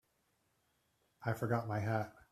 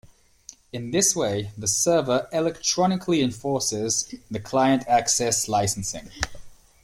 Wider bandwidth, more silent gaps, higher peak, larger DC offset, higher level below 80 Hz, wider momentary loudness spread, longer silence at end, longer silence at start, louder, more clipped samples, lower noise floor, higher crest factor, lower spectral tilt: second, 14.5 kHz vs 16.5 kHz; neither; second, -20 dBFS vs -4 dBFS; neither; second, -72 dBFS vs -50 dBFS; second, 5 LU vs 12 LU; about the same, 0.2 s vs 0.3 s; first, 1.2 s vs 0.05 s; second, -38 LUFS vs -23 LUFS; neither; first, -79 dBFS vs -50 dBFS; about the same, 20 dB vs 20 dB; first, -7.5 dB/octave vs -3.5 dB/octave